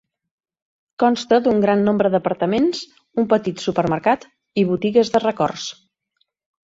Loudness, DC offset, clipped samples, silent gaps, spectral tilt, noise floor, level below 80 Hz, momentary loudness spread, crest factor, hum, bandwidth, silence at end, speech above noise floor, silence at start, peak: -19 LUFS; under 0.1%; under 0.1%; none; -6 dB/octave; -70 dBFS; -58 dBFS; 8 LU; 18 dB; none; 7.8 kHz; 0.9 s; 52 dB; 1 s; -2 dBFS